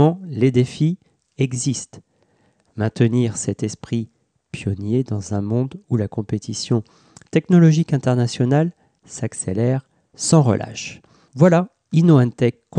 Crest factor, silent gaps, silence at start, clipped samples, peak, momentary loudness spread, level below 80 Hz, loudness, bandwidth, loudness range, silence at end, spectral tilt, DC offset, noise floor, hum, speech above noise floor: 16 dB; none; 0 s; under 0.1%; -2 dBFS; 14 LU; -58 dBFS; -19 LUFS; 10 kHz; 6 LU; 0 s; -6.5 dB/octave; under 0.1%; -61 dBFS; none; 43 dB